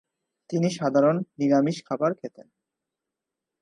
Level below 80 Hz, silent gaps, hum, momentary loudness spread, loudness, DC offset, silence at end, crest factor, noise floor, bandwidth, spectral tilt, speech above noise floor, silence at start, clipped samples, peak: -76 dBFS; none; none; 10 LU; -24 LUFS; under 0.1%; 1.35 s; 18 dB; -87 dBFS; 11 kHz; -7 dB/octave; 63 dB; 0.5 s; under 0.1%; -8 dBFS